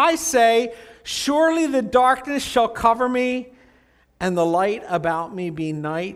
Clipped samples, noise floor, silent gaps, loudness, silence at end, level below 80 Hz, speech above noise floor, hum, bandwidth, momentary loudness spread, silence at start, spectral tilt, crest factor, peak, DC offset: under 0.1%; -57 dBFS; none; -20 LUFS; 0 s; -52 dBFS; 37 dB; none; 16 kHz; 10 LU; 0 s; -4 dB/octave; 18 dB; -2 dBFS; under 0.1%